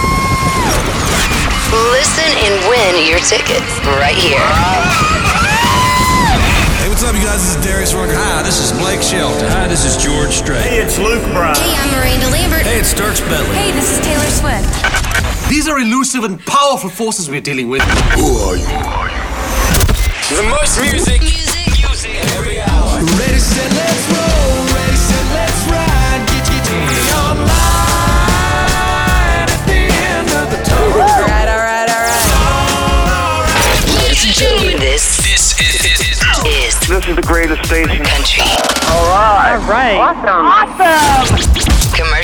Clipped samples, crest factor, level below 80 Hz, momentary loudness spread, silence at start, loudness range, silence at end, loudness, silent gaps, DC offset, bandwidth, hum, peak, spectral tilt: under 0.1%; 10 dB; -18 dBFS; 5 LU; 0 s; 3 LU; 0 s; -11 LUFS; none; under 0.1%; over 20 kHz; none; 0 dBFS; -3.5 dB/octave